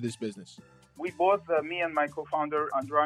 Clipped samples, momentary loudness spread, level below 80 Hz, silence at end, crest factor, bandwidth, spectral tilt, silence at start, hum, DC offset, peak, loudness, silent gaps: under 0.1%; 12 LU; -72 dBFS; 0 s; 18 dB; 13 kHz; -5.5 dB/octave; 0 s; none; under 0.1%; -12 dBFS; -29 LUFS; none